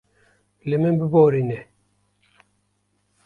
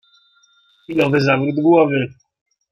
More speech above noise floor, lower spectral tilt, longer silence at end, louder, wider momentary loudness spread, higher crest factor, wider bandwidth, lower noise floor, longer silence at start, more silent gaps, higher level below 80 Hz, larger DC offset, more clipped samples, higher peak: first, 51 dB vs 41 dB; first, -10.5 dB/octave vs -7.5 dB/octave; first, 1.65 s vs 0.65 s; second, -20 LUFS vs -16 LUFS; first, 16 LU vs 10 LU; about the same, 20 dB vs 16 dB; second, 4.4 kHz vs 7.4 kHz; first, -69 dBFS vs -56 dBFS; second, 0.65 s vs 0.9 s; neither; about the same, -60 dBFS vs -60 dBFS; neither; neither; about the same, -4 dBFS vs -2 dBFS